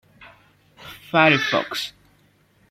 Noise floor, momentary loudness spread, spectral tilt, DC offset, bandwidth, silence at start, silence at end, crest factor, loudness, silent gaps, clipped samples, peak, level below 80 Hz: -59 dBFS; 23 LU; -4.5 dB/octave; under 0.1%; 16 kHz; 0.2 s; 0.8 s; 22 dB; -19 LUFS; none; under 0.1%; -2 dBFS; -62 dBFS